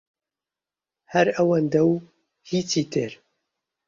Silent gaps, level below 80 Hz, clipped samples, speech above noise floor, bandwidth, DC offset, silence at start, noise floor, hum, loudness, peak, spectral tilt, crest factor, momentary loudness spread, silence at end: none; -66 dBFS; under 0.1%; 68 dB; 7.6 kHz; under 0.1%; 1.1 s; -90 dBFS; none; -23 LUFS; -6 dBFS; -5.5 dB/octave; 20 dB; 9 LU; 0.75 s